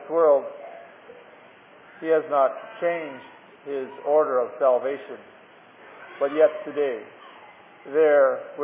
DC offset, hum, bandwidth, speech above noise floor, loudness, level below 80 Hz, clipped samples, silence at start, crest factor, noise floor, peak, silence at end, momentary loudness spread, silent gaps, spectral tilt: under 0.1%; none; 3.7 kHz; 27 dB; -23 LUFS; -86 dBFS; under 0.1%; 0 s; 18 dB; -50 dBFS; -6 dBFS; 0 s; 23 LU; none; -8.5 dB/octave